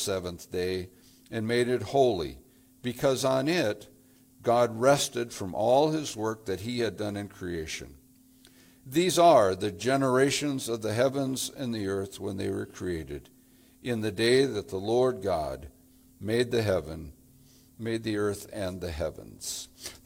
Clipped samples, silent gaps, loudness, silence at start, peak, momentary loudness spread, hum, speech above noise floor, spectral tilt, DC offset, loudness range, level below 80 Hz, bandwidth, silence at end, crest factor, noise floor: under 0.1%; none; -28 LUFS; 0 s; -8 dBFS; 14 LU; none; 30 dB; -4.5 dB/octave; under 0.1%; 7 LU; -56 dBFS; 17 kHz; 0.1 s; 20 dB; -58 dBFS